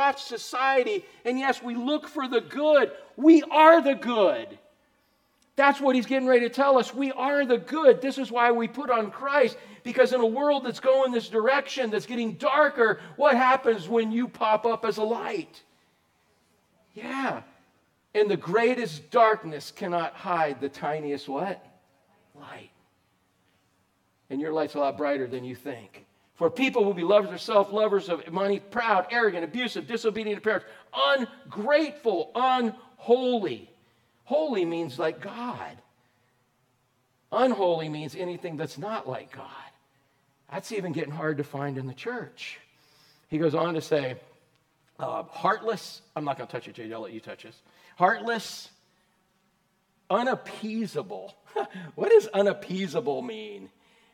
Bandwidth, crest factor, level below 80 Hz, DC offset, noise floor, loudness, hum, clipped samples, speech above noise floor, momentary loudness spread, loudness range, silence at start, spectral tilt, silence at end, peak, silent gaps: 15 kHz; 24 dB; -78 dBFS; under 0.1%; -70 dBFS; -25 LUFS; none; under 0.1%; 45 dB; 16 LU; 12 LU; 0 s; -5.5 dB/octave; 0.45 s; -2 dBFS; none